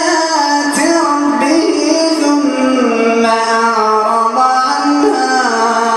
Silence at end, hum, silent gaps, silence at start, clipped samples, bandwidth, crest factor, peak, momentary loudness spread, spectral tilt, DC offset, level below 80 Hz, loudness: 0 s; none; none; 0 s; under 0.1%; 12.5 kHz; 12 dB; 0 dBFS; 1 LU; -2.5 dB/octave; under 0.1%; -58 dBFS; -12 LUFS